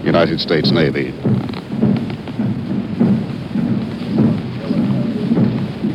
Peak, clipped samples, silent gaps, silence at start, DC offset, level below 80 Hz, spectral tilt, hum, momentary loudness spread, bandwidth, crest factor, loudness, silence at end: 0 dBFS; under 0.1%; none; 0 s; under 0.1%; -44 dBFS; -8.5 dB/octave; none; 7 LU; 9.4 kHz; 16 dB; -18 LUFS; 0 s